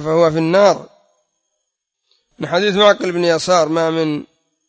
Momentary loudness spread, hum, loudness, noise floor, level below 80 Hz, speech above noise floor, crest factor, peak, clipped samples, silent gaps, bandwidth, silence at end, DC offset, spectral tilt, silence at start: 10 LU; none; -15 LUFS; -75 dBFS; -58 dBFS; 61 dB; 16 dB; 0 dBFS; under 0.1%; none; 8 kHz; 0.45 s; under 0.1%; -5 dB/octave; 0 s